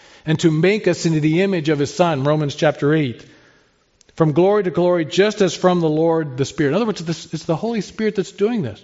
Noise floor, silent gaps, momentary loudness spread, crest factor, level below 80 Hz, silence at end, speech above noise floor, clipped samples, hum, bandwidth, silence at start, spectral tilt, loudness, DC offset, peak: -57 dBFS; none; 7 LU; 16 dB; -56 dBFS; 0.1 s; 40 dB; under 0.1%; none; 8 kHz; 0.25 s; -6 dB/octave; -18 LUFS; under 0.1%; -2 dBFS